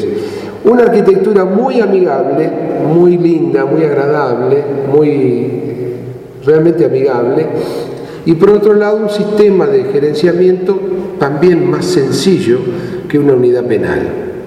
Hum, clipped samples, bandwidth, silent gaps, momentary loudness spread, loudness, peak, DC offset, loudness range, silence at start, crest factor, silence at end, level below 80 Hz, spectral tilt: none; 0.2%; 13 kHz; none; 10 LU; -11 LUFS; 0 dBFS; under 0.1%; 2 LU; 0 s; 10 dB; 0 s; -48 dBFS; -7 dB/octave